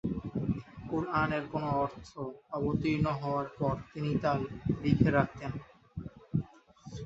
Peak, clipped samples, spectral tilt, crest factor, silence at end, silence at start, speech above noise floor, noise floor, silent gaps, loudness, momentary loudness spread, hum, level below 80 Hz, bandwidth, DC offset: -10 dBFS; under 0.1%; -8.5 dB/octave; 22 dB; 0 s; 0.05 s; 22 dB; -53 dBFS; none; -33 LUFS; 16 LU; none; -52 dBFS; 7.8 kHz; under 0.1%